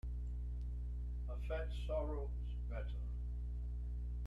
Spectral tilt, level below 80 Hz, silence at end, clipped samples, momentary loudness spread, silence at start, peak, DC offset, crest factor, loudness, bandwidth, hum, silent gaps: -8 dB/octave; -42 dBFS; 0 s; under 0.1%; 4 LU; 0.05 s; -30 dBFS; under 0.1%; 12 dB; -45 LUFS; 4.3 kHz; 60 Hz at -40 dBFS; none